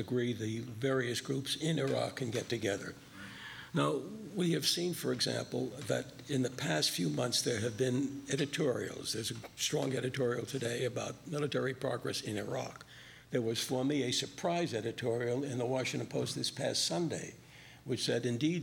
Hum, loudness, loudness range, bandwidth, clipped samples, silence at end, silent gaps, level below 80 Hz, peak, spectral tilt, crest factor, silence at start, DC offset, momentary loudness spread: none; -35 LUFS; 3 LU; 18.5 kHz; under 0.1%; 0 s; none; -70 dBFS; -18 dBFS; -4 dB/octave; 18 dB; 0 s; under 0.1%; 9 LU